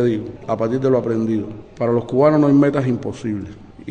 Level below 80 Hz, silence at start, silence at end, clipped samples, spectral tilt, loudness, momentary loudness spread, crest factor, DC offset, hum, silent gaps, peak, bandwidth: -50 dBFS; 0 s; 0 s; under 0.1%; -9 dB/octave; -18 LUFS; 14 LU; 16 dB; under 0.1%; none; none; -4 dBFS; 8.8 kHz